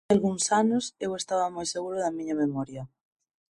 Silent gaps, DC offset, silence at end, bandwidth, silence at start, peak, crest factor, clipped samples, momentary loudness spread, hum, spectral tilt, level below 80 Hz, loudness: none; under 0.1%; 0.65 s; 11.5 kHz; 0.1 s; -10 dBFS; 18 dB; under 0.1%; 11 LU; none; -4.5 dB/octave; -64 dBFS; -28 LUFS